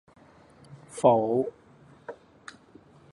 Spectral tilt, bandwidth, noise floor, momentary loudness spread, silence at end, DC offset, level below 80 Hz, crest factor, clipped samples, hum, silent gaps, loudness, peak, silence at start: -6.5 dB/octave; 11.5 kHz; -55 dBFS; 26 LU; 1 s; under 0.1%; -68 dBFS; 22 dB; under 0.1%; none; none; -25 LUFS; -8 dBFS; 0.7 s